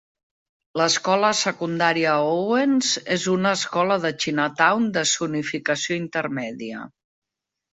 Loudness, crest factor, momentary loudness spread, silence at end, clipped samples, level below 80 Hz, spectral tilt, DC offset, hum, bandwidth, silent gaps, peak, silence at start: -21 LUFS; 20 dB; 9 LU; 0.85 s; under 0.1%; -66 dBFS; -3.5 dB/octave; under 0.1%; none; 8.4 kHz; none; -4 dBFS; 0.75 s